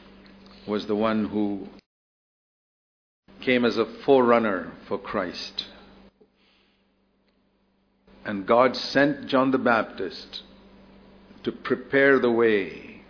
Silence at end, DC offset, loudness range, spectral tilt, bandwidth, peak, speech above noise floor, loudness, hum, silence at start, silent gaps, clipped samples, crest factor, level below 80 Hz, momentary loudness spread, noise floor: 0.1 s; under 0.1%; 10 LU; -6 dB/octave; 5.4 kHz; -4 dBFS; 44 dB; -24 LUFS; none; 0.65 s; 1.86-3.23 s; under 0.1%; 22 dB; -60 dBFS; 16 LU; -67 dBFS